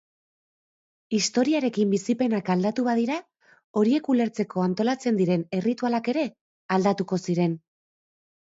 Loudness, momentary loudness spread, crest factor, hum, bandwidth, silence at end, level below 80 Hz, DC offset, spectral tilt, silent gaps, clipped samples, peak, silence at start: -25 LUFS; 5 LU; 18 dB; none; 8 kHz; 0.9 s; -72 dBFS; under 0.1%; -6 dB/octave; 3.64-3.74 s, 6.41-6.69 s; under 0.1%; -8 dBFS; 1.1 s